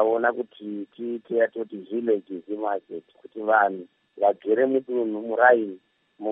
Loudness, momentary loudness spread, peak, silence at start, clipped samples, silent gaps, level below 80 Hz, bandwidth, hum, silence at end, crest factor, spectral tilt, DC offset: -24 LUFS; 15 LU; -4 dBFS; 0 s; under 0.1%; none; -82 dBFS; 3.9 kHz; none; 0 s; 22 dB; -9 dB/octave; under 0.1%